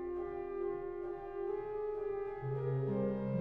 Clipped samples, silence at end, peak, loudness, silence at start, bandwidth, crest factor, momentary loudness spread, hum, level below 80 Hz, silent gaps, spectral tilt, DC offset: under 0.1%; 0 s; -26 dBFS; -39 LUFS; 0 s; 4.2 kHz; 12 dB; 6 LU; none; -60 dBFS; none; -11.5 dB/octave; under 0.1%